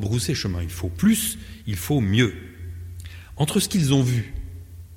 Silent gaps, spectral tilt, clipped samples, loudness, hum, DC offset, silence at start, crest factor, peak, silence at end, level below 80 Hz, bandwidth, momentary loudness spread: none; -5 dB/octave; under 0.1%; -23 LUFS; none; under 0.1%; 0 s; 18 dB; -6 dBFS; 0 s; -42 dBFS; 17 kHz; 18 LU